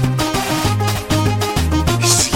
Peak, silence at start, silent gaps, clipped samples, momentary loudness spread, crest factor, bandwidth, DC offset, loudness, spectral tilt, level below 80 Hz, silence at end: -2 dBFS; 0 s; none; under 0.1%; 5 LU; 14 dB; 17 kHz; under 0.1%; -16 LUFS; -4 dB/octave; -30 dBFS; 0 s